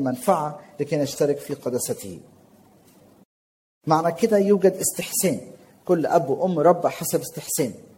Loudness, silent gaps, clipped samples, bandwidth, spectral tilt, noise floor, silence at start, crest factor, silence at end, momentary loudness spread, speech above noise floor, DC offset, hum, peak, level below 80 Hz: -22 LUFS; 3.25-3.81 s; under 0.1%; 17 kHz; -5 dB/octave; -54 dBFS; 0 s; 20 dB; 0.15 s; 13 LU; 32 dB; under 0.1%; none; -4 dBFS; -66 dBFS